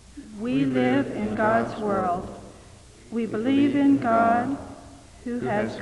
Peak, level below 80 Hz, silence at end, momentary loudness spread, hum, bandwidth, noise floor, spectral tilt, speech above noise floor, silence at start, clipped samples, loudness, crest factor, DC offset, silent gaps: -8 dBFS; -52 dBFS; 0 s; 19 LU; none; 11 kHz; -48 dBFS; -7 dB/octave; 25 dB; 0.15 s; under 0.1%; -24 LUFS; 16 dB; under 0.1%; none